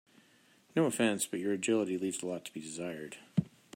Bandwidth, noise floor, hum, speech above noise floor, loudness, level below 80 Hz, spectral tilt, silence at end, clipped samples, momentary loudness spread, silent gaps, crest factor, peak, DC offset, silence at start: 16 kHz; -65 dBFS; none; 32 dB; -34 LUFS; -74 dBFS; -4.5 dB/octave; 0.3 s; under 0.1%; 11 LU; none; 20 dB; -16 dBFS; under 0.1%; 0.75 s